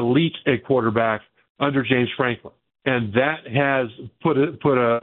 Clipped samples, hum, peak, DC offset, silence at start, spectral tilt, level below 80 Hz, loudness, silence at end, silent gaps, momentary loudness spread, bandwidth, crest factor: under 0.1%; none; -2 dBFS; under 0.1%; 0 s; -11.5 dB/octave; -60 dBFS; -21 LUFS; 0 s; 1.50-1.55 s; 6 LU; 4.2 kHz; 18 dB